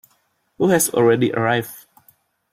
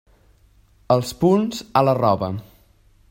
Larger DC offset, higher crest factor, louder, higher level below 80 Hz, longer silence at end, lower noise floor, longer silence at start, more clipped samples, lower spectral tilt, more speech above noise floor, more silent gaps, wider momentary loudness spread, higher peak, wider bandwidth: neither; about the same, 16 dB vs 20 dB; about the same, -18 LUFS vs -20 LUFS; second, -60 dBFS vs -52 dBFS; about the same, 0.75 s vs 0.7 s; first, -65 dBFS vs -55 dBFS; second, 0.6 s vs 0.9 s; neither; second, -4.5 dB/octave vs -7 dB/octave; first, 47 dB vs 36 dB; neither; about the same, 7 LU vs 7 LU; about the same, -4 dBFS vs -2 dBFS; about the same, 16.5 kHz vs 16.5 kHz